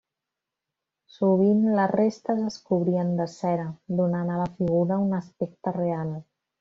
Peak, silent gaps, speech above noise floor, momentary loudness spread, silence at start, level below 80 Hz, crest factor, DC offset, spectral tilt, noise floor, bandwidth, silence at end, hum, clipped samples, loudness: -10 dBFS; none; 62 dB; 9 LU; 1.2 s; -64 dBFS; 16 dB; under 0.1%; -8.5 dB/octave; -87 dBFS; 7.4 kHz; 0.4 s; none; under 0.1%; -25 LUFS